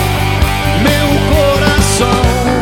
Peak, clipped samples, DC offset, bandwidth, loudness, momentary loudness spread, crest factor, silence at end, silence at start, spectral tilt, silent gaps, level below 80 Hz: 0 dBFS; under 0.1%; under 0.1%; 17.5 kHz; -11 LUFS; 3 LU; 10 dB; 0 s; 0 s; -5 dB/octave; none; -18 dBFS